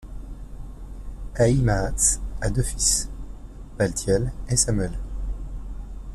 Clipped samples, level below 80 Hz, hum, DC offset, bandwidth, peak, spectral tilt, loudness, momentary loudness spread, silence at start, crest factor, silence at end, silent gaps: under 0.1%; -32 dBFS; none; under 0.1%; 14.5 kHz; -6 dBFS; -4 dB/octave; -23 LUFS; 21 LU; 0 s; 18 dB; 0 s; none